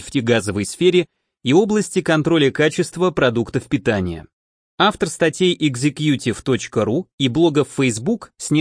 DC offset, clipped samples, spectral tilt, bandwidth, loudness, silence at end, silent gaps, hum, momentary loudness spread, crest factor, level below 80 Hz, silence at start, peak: under 0.1%; under 0.1%; -5 dB/octave; 10.5 kHz; -18 LUFS; 0 s; 4.33-4.78 s, 7.13-7.18 s; none; 7 LU; 16 dB; -50 dBFS; 0 s; -2 dBFS